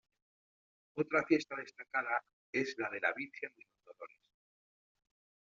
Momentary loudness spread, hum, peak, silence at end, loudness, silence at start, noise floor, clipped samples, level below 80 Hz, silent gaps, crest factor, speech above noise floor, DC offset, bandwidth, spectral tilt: 20 LU; none; -16 dBFS; 1.35 s; -37 LUFS; 0.95 s; -55 dBFS; under 0.1%; -82 dBFS; 2.33-2.53 s; 24 dB; 18 dB; under 0.1%; 7.4 kHz; -3.5 dB/octave